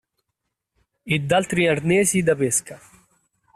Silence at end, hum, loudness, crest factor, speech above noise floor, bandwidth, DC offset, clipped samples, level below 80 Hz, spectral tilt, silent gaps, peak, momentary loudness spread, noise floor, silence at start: 0.8 s; none; -20 LUFS; 16 dB; 59 dB; 14.5 kHz; under 0.1%; under 0.1%; -56 dBFS; -4 dB/octave; none; -6 dBFS; 6 LU; -80 dBFS; 1.05 s